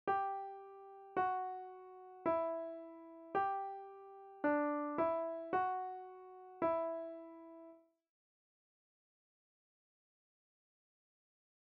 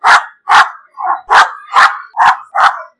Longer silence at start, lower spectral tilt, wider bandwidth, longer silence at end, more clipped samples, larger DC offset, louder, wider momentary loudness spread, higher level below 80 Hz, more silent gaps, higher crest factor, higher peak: about the same, 0.05 s vs 0.05 s; first, -4.5 dB/octave vs 0.5 dB/octave; second, 5.4 kHz vs 12 kHz; first, 3.9 s vs 0.15 s; second, under 0.1% vs 0.9%; neither; second, -40 LUFS vs -10 LUFS; first, 18 LU vs 8 LU; second, -82 dBFS vs -54 dBFS; neither; first, 18 dB vs 10 dB; second, -24 dBFS vs 0 dBFS